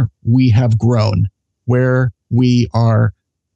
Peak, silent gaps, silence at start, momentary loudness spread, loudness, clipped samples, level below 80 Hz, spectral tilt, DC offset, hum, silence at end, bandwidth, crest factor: -4 dBFS; none; 0 s; 7 LU; -14 LUFS; under 0.1%; -40 dBFS; -8.5 dB/octave; under 0.1%; none; 0.45 s; 7.6 kHz; 10 dB